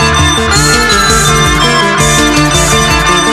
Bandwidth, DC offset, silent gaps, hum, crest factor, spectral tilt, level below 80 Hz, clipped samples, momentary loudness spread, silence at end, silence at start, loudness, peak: 15.5 kHz; 0.3%; none; none; 8 dB; -3 dB/octave; -20 dBFS; 0.2%; 1 LU; 0 s; 0 s; -7 LUFS; 0 dBFS